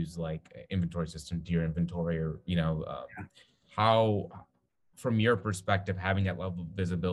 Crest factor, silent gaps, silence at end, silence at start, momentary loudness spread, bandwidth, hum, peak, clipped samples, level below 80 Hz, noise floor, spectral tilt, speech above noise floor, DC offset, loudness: 22 dB; none; 0 s; 0 s; 14 LU; 12 kHz; none; -10 dBFS; under 0.1%; -52 dBFS; -70 dBFS; -6.5 dB/octave; 39 dB; under 0.1%; -31 LUFS